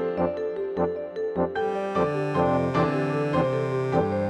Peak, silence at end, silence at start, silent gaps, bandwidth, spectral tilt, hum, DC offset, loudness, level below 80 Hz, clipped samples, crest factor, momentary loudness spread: -10 dBFS; 0 s; 0 s; none; 9.8 kHz; -8 dB/octave; none; under 0.1%; -26 LUFS; -54 dBFS; under 0.1%; 16 dB; 5 LU